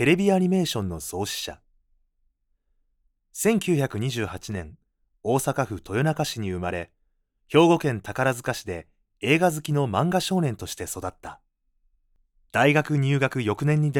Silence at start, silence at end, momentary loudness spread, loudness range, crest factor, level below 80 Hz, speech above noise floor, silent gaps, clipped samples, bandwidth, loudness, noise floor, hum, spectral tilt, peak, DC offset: 0 s; 0 s; 14 LU; 5 LU; 20 dB; -56 dBFS; 47 dB; none; under 0.1%; 18.5 kHz; -24 LUFS; -71 dBFS; none; -5.5 dB/octave; -6 dBFS; under 0.1%